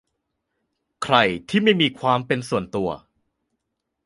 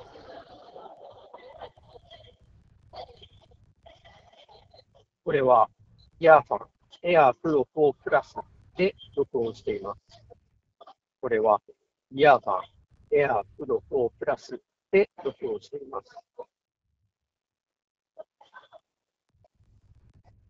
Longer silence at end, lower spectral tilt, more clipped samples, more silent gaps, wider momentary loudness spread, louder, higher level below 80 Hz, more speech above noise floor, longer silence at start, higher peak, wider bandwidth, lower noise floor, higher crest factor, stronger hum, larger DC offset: second, 1.1 s vs 2.25 s; second, -5.5 dB/octave vs -7 dB/octave; neither; second, none vs 17.90-17.95 s; second, 10 LU vs 27 LU; first, -21 LUFS vs -25 LUFS; first, -56 dBFS vs -62 dBFS; about the same, 58 dB vs 60 dB; first, 1 s vs 0.3 s; about the same, -2 dBFS vs -4 dBFS; first, 11.5 kHz vs 7.2 kHz; second, -79 dBFS vs -84 dBFS; about the same, 22 dB vs 26 dB; neither; neither